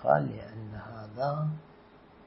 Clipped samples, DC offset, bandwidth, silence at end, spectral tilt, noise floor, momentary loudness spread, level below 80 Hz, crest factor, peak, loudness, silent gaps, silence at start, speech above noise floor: under 0.1%; under 0.1%; 5.8 kHz; 0 s; -7 dB/octave; -55 dBFS; 16 LU; -62 dBFS; 24 dB; -10 dBFS; -34 LUFS; none; 0 s; 24 dB